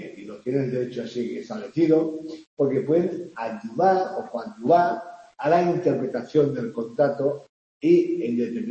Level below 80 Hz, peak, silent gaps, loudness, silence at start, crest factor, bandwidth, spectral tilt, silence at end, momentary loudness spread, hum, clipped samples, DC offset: -70 dBFS; -6 dBFS; 2.47-2.57 s, 7.49-7.80 s; -24 LUFS; 0 s; 18 dB; 8 kHz; -8 dB/octave; 0 s; 13 LU; none; under 0.1%; under 0.1%